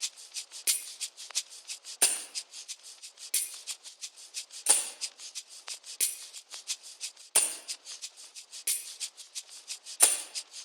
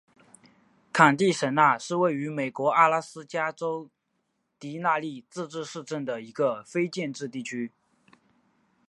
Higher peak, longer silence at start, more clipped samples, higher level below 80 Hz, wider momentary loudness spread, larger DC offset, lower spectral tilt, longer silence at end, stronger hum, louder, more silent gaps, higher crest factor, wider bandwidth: about the same, -4 dBFS vs -4 dBFS; second, 0 s vs 0.95 s; neither; second, under -90 dBFS vs -80 dBFS; about the same, 17 LU vs 15 LU; neither; second, 4 dB/octave vs -5 dB/octave; second, 0 s vs 1.2 s; neither; second, -30 LUFS vs -26 LUFS; neither; first, 32 dB vs 24 dB; first, over 20 kHz vs 11.5 kHz